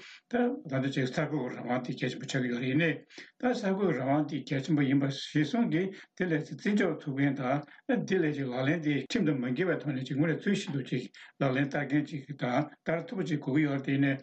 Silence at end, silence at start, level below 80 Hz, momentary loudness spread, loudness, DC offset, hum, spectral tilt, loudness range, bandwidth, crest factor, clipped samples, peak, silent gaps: 0 s; 0 s; -72 dBFS; 6 LU; -31 LUFS; under 0.1%; none; -7 dB/octave; 2 LU; 8.6 kHz; 12 dB; under 0.1%; -18 dBFS; none